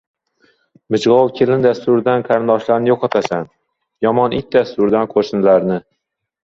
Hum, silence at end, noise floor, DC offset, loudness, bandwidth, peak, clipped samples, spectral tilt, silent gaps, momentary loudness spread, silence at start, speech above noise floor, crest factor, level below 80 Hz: none; 0.8 s; -58 dBFS; under 0.1%; -15 LUFS; 7.8 kHz; 0 dBFS; under 0.1%; -7 dB/octave; none; 8 LU; 0.9 s; 44 dB; 16 dB; -52 dBFS